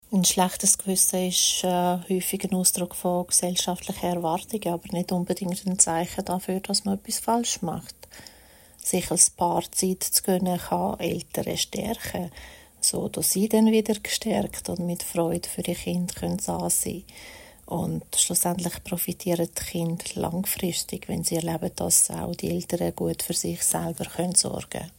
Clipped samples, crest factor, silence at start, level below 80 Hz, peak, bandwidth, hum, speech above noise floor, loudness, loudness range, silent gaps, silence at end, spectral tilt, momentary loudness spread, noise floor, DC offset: under 0.1%; 22 dB; 0.1 s; -52 dBFS; -4 dBFS; 16.5 kHz; none; 26 dB; -25 LUFS; 4 LU; none; 0.1 s; -3.5 dB/octave; 10 LU; -52 dBFS; under 0.1%